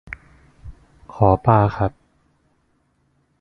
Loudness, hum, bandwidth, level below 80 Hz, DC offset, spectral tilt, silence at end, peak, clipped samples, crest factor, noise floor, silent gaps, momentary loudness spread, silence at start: -18 LUFS; none; 5.8 kHz; -40 dBFS; under 0.1%; -10.5 dB/octave; 1.5 s; 0 dBFS; under 0.1%; 22 dB; -65 dBFS; none; 22 LU; 0.65 s